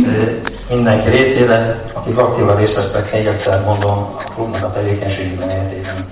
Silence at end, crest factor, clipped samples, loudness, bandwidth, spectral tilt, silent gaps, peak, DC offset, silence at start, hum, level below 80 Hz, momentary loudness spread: 0 s; 14 dB; under 0.1%; -15 LUFS; 4 kHz; -11 dB/octave; none; -2 dBFS; 0.3%; 0 s; none; -34 dBFS; 10 LU